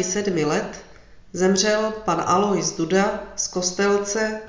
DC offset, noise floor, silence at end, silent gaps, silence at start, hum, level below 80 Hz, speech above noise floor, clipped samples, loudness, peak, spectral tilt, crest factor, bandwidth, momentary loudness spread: under 0.1%; -46 dBFS; 0 s; none; 0 s; none; -50 dBFS; 24 dB; under 0.1%; -21 LUFS; -4 dBFS; -3.5 dB/octave; 18 dB; 7.6 kHz; 7 LU